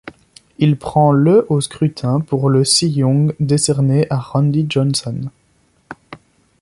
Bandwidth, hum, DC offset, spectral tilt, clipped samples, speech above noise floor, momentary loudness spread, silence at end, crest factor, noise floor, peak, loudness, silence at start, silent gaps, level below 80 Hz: 11.5 kHz; none; under 0.1%; -5.5 dB/octave; under 0.1%; 43 dB; 8 LU; 0.45 s; 16 dB; -58 dBFS; 0 dBFS; -15 LUFS; 0.05 s; none; -50 dBFS